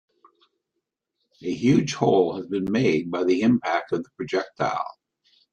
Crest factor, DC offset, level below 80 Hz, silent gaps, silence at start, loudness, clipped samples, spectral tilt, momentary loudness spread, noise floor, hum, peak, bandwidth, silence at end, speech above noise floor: 20 dB; under 0.1%; -62 dBFS; none; 1.4 s; -23 LUFS; under 0.1%; -6.5 dB/octave; 10 LU; -81 dBFS; none; -4 dBFS; 8.6 kHz; 0.6 s; 59 dB